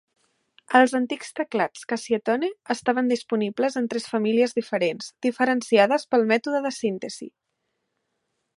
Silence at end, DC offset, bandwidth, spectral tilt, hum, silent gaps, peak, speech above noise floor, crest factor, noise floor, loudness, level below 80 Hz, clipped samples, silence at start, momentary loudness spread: 1.3 s; under 0.1%; 11.5 kHz; -4.5 dB/octave; none; none; -2 dBFS; 54 dB; 22 dB; -77 dBFS; -23 LUFS; -74 dBFS; under 0.1%; 0.7 s; 9 LU